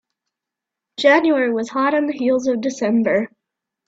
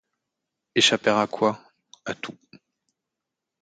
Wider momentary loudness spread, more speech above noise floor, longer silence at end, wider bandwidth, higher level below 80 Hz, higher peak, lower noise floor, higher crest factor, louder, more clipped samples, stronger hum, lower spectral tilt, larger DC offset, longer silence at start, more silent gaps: second, 7 LU vs 19 LU; first, 67 dB vs 62 dB; second, 0.6 s vs 1.3 s; second, 8 kHz vs 9.6 kHz; about the same, -66 dBFS vs -70 dBFS; first, 0 dBFS vs -4 dBFS; about the same, -85 dBFS vs -85 dBFS; second, 18 dB vs 24 dB; first, -18 LUFS vs -22 LUFS; neither; neither; first, -4.5 dB/octave vs -3 dB/octave; neither; first, 1 s vs 0.75 s; neither